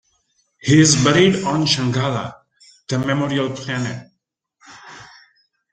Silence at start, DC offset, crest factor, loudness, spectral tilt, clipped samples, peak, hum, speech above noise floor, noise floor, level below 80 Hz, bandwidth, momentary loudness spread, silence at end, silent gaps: 0.65 s; under 0.1%; 18 dB; -17 LUFS; -4.5 dB/octave; under 0.1%; 0 dBFS; none; 56 dB; -73 dBFS; -54 dBFS; 9.4 kHz; 21 LU; 0.65 s; none